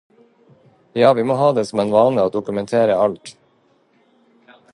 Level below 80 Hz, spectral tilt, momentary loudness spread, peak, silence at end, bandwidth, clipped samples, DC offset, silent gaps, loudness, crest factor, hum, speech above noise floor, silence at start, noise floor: -60 dBFS; -6.5 dB/octave; 8 LU; 0 dBFS; 1.4 s; 11 kHz; under 0.1%; under 0.1%; none; -17 LUFS; 18 dB; none; 42 dB; 0.95 s; -59 dBFS